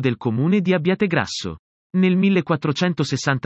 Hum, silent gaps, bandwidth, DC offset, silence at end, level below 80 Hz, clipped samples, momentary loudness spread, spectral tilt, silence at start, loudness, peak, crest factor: none; 1.59-1.90 s; 8.2 kHz; under 0.1%; 0.05 s; -58 dBFS; under 0.1%; 9 LU; -6 dB/octave; 0 s; -20 LUFS; -4 dBFS; 16 dB